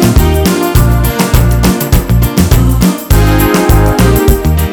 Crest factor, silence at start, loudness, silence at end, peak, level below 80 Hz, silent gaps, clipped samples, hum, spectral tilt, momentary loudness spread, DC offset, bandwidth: 8 dB; 0 s; -9 LUFS; 0 s; 0 dBFS; -12 dBFS; none; 1%; none; -6 dB/octave; 2 LU; under 0.1%; over 20 kHz